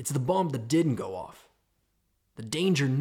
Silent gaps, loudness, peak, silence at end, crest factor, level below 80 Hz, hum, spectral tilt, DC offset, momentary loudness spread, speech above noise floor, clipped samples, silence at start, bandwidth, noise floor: none; -28 LUFS; -14 dBFS; 0 s; 16 dB; -66 dBFS; none; -5.5 dB/octave; under 0.1%; 16 LU; 46 dB; under 0.1%; 0 s; 16.5 kHz; -74 dBFS